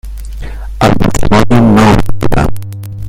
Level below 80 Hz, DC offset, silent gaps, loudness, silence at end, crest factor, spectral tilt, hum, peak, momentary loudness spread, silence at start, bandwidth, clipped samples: -18 dBFS; under 0.1%; none; -10 LUFS; 0 s; 8 dB; -6.5 dB/octave; none; 0 dBFS; 19 LU; 0.05 s; 16 kHz; 0.5%